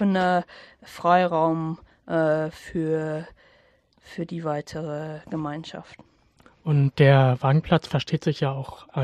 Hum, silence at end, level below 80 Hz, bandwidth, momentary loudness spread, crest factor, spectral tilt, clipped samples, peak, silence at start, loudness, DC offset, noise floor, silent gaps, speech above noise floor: none; 0 s; -56 dBFS; 9 kHz; 17 LU; 20 dB; -7.5 dB/octave; under 0.1%; -4 dBFS; 0 s; -24 LUFS; under 0.1%; -60 dBFS; none; 37 dB